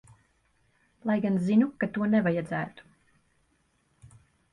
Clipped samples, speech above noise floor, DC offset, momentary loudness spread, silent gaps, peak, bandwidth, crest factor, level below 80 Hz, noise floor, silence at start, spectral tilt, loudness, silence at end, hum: under 0.1%; 44 dB; under 0.1%; 10 LU; none; -12 dBFS; 9.8 kHz; 18 dB; -66 dBFS; -70 dBFS; 1.05 s; -8.5 dB/octave; -27 LUFS; 1.7 s; none